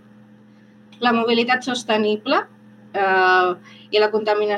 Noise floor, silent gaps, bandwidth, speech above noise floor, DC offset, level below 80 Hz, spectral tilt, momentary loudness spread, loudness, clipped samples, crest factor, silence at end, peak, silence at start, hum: -49 dBFS; none; 11.5 kHz; 30 dB; under 0.1%; -80 dBFS; -4 dB/octave; 7 LU; -19 LUFS; under 0.1%; 16 dB; 0 s; -4 dBFS; 1 s; none